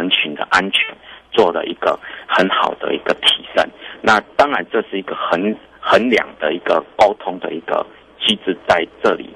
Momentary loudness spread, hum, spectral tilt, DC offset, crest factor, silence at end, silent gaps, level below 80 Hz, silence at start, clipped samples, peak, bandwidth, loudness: 9 LU; none; -3.5 dB/octave; under 0.1%; 16 dB; 0 s; none; -52 dBFS; 0 s; under 0.1%; -2 dBFS; 12.5 kHz; -17 LUFS